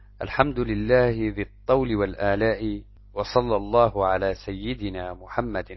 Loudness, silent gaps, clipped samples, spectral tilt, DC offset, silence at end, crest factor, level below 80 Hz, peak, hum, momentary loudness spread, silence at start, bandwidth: -24 LUFS; none; under 0.1%; -8 dB/octave; under 0.1%; 0 s; 22 dB; -40 dBFS; -4 dBFS; none; 11 LU; 0.2 s; 6 kHz